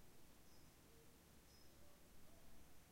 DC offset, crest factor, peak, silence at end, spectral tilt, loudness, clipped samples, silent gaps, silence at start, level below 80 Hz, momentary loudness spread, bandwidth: under 0.1%; 12 dB; -50 dBFS; 0 s; -3.5 dB/octave; -68 LUFS; under 0.1%; none; 0 s; -74 dBFS; 1 LU; 16 kHz